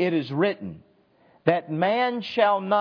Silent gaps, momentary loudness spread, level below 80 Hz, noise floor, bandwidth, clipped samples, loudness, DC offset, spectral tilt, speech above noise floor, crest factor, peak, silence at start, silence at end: none; 5 LU; -70 dBFS; -60 dBFS; 5.4 kHz; under 0.1%; -24 LUFS; under 0.1%; -8 dB/octave; 36 dB; 22 dB; -2 dBFS; 0 s; 0 s